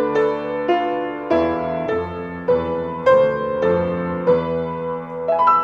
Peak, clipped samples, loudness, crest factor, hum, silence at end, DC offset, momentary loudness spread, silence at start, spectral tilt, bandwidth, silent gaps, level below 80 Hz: -4 dBFS; under 0.1%; -20 LUFS; 16 dB; none; 0 s; under 0.1%; 9 LU; 0 s; -8 dB/octave; 7 kHz; none; -52 dBFS